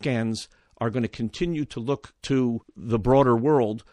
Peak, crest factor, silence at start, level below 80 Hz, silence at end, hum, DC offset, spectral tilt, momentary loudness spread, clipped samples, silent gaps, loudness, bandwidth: -6 dBFS; 18 dB; 0 s; -46 dBFS; 0.1 s; none; under 0.1%; -7 dB/octave; 12 LU; under 0.1%; none; -25 LUFS; 11 kHz